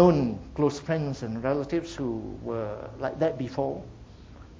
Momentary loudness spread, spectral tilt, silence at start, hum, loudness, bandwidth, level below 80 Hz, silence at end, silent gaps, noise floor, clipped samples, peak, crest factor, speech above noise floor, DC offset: 12 LU; -7.5 dB/octave; 0 s; none; -29 LUFS; 7.8 kHz; -50 dBFS; 0 s; none; -47 dBFS; under 0.1%; -6 dBFS; 22 dB; 20 dB; under 0.1%